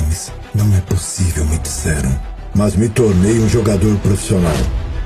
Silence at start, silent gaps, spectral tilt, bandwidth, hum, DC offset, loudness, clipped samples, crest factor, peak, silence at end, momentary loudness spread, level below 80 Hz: 0 s; none; -6 dB/octave; 14.5 kHz; none; under 0.1%; -16 LUFS; under 0.1%; 14 dB; -2 dBFS; 0 s; 8 LU; -24 dBFS